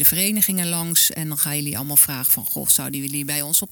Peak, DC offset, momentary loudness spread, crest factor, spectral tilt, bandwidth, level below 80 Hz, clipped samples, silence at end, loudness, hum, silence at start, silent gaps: 0 dBFS; under 0.1%; 8 LU; 20 dB; -2 dB/octave; 19.5 kHz; -56 dBFS; under 0.1%; 0 s; -18 LUFS; none; 0 s; none